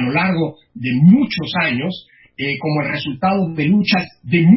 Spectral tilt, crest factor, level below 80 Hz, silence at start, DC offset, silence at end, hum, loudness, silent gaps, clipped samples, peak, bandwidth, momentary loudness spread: -10.5 dB/octave; 14 dB; -52 dBFS; 0 s; under 0.1%; 0 s; none; -17 LUFS; none; under 0.1%; -2 dBFS; 5.8 kHz; 13 LU